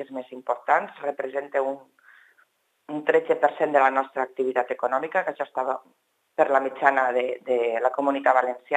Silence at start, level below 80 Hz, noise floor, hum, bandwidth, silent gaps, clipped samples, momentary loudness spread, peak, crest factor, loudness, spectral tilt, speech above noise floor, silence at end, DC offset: 0 s; under -90 dBFS; -65 dBFS; none; 9.2 kHz; none; under 0.1%; 10 LU; -2 dBFS; 22 dB; -24 LUFS; -5.5 dB/octave; 41 dB; 0 s; under 0.1%